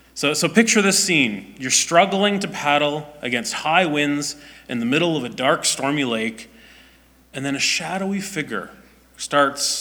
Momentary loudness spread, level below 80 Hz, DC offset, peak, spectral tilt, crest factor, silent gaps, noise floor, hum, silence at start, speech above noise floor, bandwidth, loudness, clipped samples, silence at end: 13 LU; -58 dBFS; under 0.1%; -2 dBFS; -3 dB/octave; 20 dB; none; -52 dBFS; none; 0.15 s; 32 dB; over 20 kHz; -19 LUFS; under 0.1%; 0 s